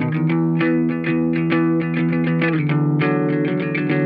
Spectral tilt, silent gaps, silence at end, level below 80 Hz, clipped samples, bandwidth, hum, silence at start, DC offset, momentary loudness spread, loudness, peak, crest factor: -10.5 dB/octave; none; 0 s; -58 dBFS; under 0.1%; 4.9 kHz; none; 0 s; under 0.1%; 2 LU; -19 LUFS; -6 dBFS; 12 dB